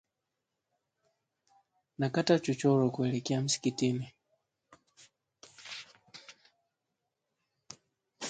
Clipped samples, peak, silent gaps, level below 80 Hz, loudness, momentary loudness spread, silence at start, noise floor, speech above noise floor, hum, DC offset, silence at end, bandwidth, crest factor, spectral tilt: under 0.1%; -12 dBFS; none; -74 dBFS; -30 LUFS; 24 LU; 2 s; -86 dBFS; 57 dB; none; under 0.1%; 0 s; 9.4 kHz; 22 dB; -5 dB/octave